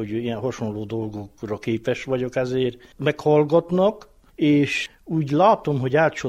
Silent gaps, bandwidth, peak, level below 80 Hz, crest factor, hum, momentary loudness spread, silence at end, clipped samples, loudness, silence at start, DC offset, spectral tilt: none; 11.5 kHz; -4 dBFS; -54 dBFS; 18 dB; none; 12 LU; 0 s; under 0.1%; -22 LUFS; 0 s; under 0.1%; -7 dB/octave